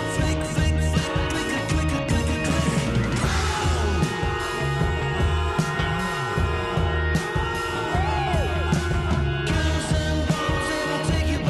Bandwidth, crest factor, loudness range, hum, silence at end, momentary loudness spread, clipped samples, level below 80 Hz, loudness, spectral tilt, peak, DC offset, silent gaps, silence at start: 12.5 kHz; 12 dB; 1 LU; none; 0 s; 2 LU; under 0.1%; -30 dBFS; -24 LUFS; -5.5 dB/octave; -10 dBFS; under 0.1%; none; 0 s